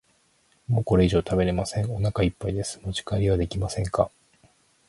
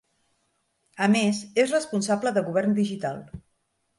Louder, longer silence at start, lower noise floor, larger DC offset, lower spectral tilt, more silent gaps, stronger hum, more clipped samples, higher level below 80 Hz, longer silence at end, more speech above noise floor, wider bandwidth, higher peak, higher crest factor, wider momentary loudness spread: about the same, -25 LUFS vs -24 LUFS; second, 0.7 s vs 0.95 s; second, -65 dBFS vs -73 dBFS; neither; first, -6.5 dB/octave vs -5 dB/octave; neither; neither; neither; first, -40 dBFS vs -62 dBFS; first, 0.8 s vs 0.6 s; second, 41 dB vs 49 dB; about the same, 11.5 kHz vs 11.5 kHz; about the same, -6 dBFS vs -8 dBFS; about the same, 20 dB vs 18 dB; second, 9 LU vs 13 LU